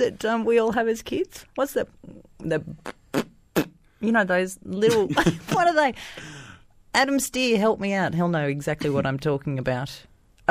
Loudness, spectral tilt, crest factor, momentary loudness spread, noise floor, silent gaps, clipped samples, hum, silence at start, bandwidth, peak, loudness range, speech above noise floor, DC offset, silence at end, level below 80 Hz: -24 LUFS; -5 dB/octave; 18 dB; 15 LU; -49 dBFS; none; under 0.1%; none; 0 s; 15.5 kHz; -6 dBFS; 5 LU; 25 dB; under 0.1%; 0.5 s; -52 dBFS